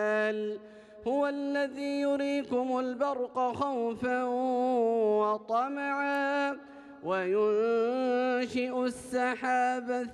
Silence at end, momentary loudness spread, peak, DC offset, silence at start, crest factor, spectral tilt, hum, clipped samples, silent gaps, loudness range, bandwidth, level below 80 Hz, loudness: 0 s; 6 LU; -18 dBFS; under 0.1%; 0 s; 12 dB; -5 dB/octave; none; under 0.1%; none; 2 LU; 12 kHz; -72 dBFS; -30 LUFS